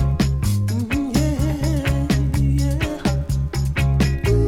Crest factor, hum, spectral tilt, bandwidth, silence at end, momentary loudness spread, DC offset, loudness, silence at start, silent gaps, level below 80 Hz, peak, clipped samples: 12 dB; none; -6.5 dB/octave; 16 kHz; 0 s; 3 LU; under 0.1%; -20 LUFS; 0 s; none; -24 dBFS; -6 dBFS; under 0.1%